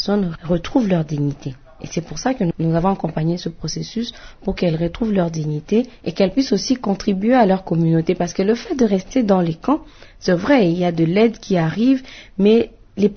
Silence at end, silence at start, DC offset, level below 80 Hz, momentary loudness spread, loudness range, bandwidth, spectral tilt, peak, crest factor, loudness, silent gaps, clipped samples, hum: 0 s; 0 s; under 0.1%; -42 dBFS; 11 LU; 4 LU; 6.6 kHz; -6.5 dB/octave; -2 dBFS; 16 dB; -19 LUFS; none; under 0.1%; none